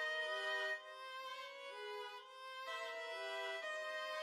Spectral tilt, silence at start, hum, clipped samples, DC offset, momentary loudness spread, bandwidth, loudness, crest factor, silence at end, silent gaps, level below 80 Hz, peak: 2 dB/octave; 0 s; none; under 0.1%; under 0.1%; 10 LU; 16 kHz; -45 LUFS; 14 dB; 0 s; none; under -90 dBFS; -30 dBFS